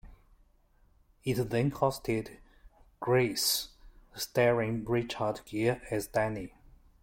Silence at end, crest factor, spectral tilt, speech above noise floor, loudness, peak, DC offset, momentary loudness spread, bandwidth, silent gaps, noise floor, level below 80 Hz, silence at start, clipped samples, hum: 0.55 s; 20 dB; -4.5 dB/octave; 35 dB; -31 LUFS; -12 dBFS; under 0.1%; 12 LU; 16.5 kHz; none; -65 dBFS; -56 dBFS; 0.05 s; under 0.1%; none